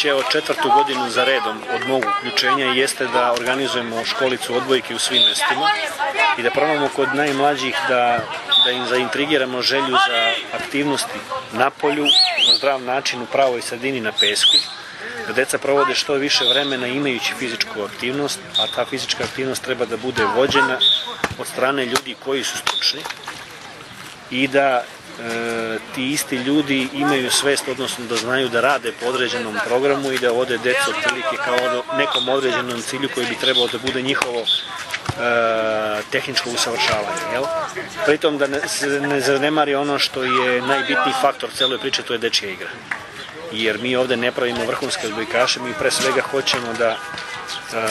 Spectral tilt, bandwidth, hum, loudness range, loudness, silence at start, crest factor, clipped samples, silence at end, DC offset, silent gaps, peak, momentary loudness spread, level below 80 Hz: -2.5 dB/octave; 13 kHz; none; 4 LU; -19 LUFS; 0 s; 20 dB; under 0.1%; 0 s; under 0.1%; none; 0 dBFS; 9 LU; -58 dBFS